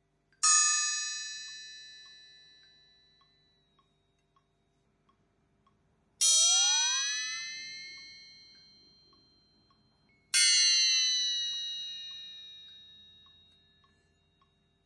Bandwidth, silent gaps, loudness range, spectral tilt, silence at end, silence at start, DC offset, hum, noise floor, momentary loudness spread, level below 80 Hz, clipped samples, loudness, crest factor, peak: 11.5 kHz; none; 15 LU; 5 dB/octave; 2.05 s; 0.45 s; under 0.1%; none; -74 dBFS; 25 LU; -82 dBFS; under 0.1%; -25 LUFS; 22 dB; -12 dBFS